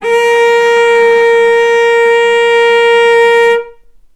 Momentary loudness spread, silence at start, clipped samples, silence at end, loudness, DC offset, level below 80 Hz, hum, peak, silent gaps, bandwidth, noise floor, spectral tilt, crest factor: 2 LU; 0 s; under 0.1%; 0.45 s; -8 LUFS; under 0.1%; -52 dBFS; none; 0 dBFS; none; 12 kHz; -36 dBFS; -1 dB/octave; 8 dB